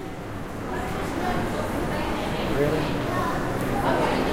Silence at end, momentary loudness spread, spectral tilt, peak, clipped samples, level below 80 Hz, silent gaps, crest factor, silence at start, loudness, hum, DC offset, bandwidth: 0 s; 9 LU; -6 dB/octave; -10 dBFS; under 0.1%; -38 dBFS; none; 16 dB; 0 s; -26 LUFS; none; under 0.1%; 16 kHz